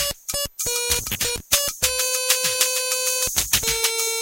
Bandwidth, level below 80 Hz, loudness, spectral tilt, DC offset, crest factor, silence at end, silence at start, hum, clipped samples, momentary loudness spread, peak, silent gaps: 16.5 kHz; -42 dBFS; -20 LUFS; 0.5 dB/octave; under 0.1%; 22 dB; 0 s; 0 s; none; under 0.1%; 5 LU; 0 dBFS; none